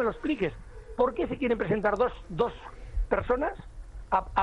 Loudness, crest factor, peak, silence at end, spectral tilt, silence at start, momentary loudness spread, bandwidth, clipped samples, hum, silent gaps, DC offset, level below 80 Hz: -29 LUFS; 18 dB; -10 dBFS; 0 s; -7.5 dB/octave; 0 s; 18 LU; 9.4 kHz; under 0.1%; none; none; under 0.1%; -40 dBFS